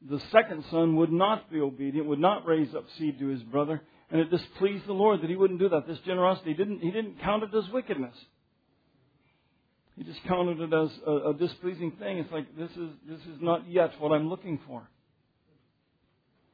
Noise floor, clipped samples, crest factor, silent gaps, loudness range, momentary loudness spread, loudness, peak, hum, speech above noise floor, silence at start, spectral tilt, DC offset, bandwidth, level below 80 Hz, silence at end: -72 dBFS; under 0.1%; 24 dB; none; 6 LU; 13 LU; -28 LUFS; -6 dBFS; none; 44 dB; 0 s; -9.5 dB/octave; under 0.1%; 5 kHz; -66 dBFS; 1.7 s